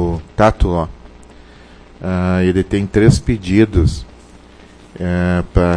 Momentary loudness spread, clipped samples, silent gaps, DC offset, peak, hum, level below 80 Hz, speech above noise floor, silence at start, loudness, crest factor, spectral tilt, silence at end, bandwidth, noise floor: 10 LU; under 0.1%; none; under 0.1%; 0 dBFS; 60 Hz at -40 dBFS; -26 dBFS; 27 dB; 0 s; -15 LUFS; 16 dB; -7.5 dB/octave; 0 s; 10.5 kHz; -41 dBFS